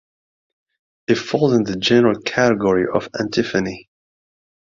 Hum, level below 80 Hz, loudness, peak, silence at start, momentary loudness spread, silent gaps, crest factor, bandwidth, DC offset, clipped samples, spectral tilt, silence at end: none; -52 dBFS; -18 LUFS; -2 dBFS; 1.1 s; 8 LU; none; 18 dB; 7.6 kHz; under 0.1%; under 0.1%; -5.5 dB/octave; 0.85 s